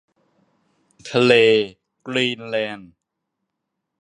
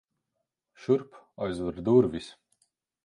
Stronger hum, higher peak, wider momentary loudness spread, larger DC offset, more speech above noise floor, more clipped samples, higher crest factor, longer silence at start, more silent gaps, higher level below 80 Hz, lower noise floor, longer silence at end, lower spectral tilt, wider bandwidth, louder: neither; first, -2 dBFS vs -10 dBFS; first, 24 LU vs 19 LU; neither; first, 61 dB vs 57 dB; neither; about the same, 20 dB vs 20 dB; first, 1.05 s vs 0.8 s; neither; second, -66 dBFS vs -58 dBFS; second, -79 dBFS vs -83 dBFS; first, 1.2 s vs 0.75 s; second, -5 dB/octave vs -8 dB/octave; about the same, 10.5 kHz vs 10.5 kHz; first, -19 LUFS vs -27 LUFS